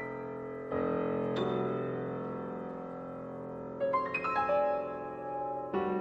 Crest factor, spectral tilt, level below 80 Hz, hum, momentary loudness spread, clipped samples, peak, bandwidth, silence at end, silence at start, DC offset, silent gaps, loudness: 14 dB; -8 dB/octave; -66 dBFS; none; 12 LU; under 0.1%; -20 dBFS; 7.8 kHz; 0 s; 0 s; under 0.1%; none; -35 LUFS